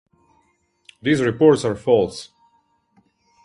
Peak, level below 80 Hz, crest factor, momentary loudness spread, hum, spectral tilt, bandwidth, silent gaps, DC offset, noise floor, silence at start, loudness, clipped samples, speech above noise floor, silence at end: -2 dBFS; -54 dBFS; 20 dB; 12 LU; none; -6 dB/octave; 11.5 kHz; none; under 0.1%; -64 dBFS; 1.05 s; -18 LUFS; under 0.1%; 47 dB; 1.2 s